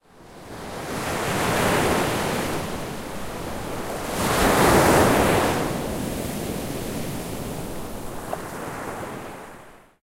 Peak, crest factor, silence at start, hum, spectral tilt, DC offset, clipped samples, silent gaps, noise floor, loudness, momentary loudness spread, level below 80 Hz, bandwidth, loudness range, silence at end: -4 dBFS; 20 dB; 0.15 s; none; -4.5 dB/octave; under 0.1%; under 0.1%; none; -46 dBFS; -24 LUFS; 17 LU; -40 dBFS; 16 kHz; 11 LU; 0.25 s